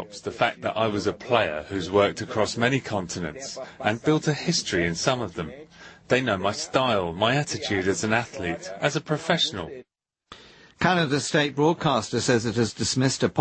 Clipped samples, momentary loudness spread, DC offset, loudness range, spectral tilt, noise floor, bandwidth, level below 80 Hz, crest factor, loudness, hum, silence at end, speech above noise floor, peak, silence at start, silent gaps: under 0.1%; 9 LU; under 0.1%; 2 LU; -4.5 dB/octave; -51 dBFS; 8.8 kHz; -56 dBFS; 22 dB; -25 LUFS; none; 0 s; 26 dB; -4 dBFS; 0 s; none